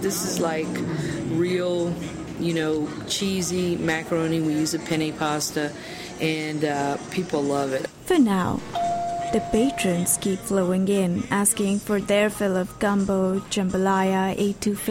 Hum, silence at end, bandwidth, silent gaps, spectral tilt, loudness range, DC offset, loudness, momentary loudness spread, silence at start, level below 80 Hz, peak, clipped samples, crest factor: none; 0 s; 16.5 kHz; none; -4.5 dB/octave; 3 LU; under 0.1%; -24 LUFS; 6 LU; 0 s; -50 dBFS; -6 dBFS; under 0.1%; 18 dB